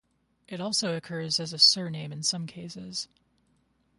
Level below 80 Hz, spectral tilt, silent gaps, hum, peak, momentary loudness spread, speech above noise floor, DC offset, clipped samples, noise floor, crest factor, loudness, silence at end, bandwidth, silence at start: -72 dBFS; -2.5 dB/octave; none; none; -6 dBFS; 20 LU; 41 dB; under 0.1%; under 0.1%; -69 dBFS; 24 dB; -26 LUFS; 0.95 s; 11.5 kHz; 0.5 s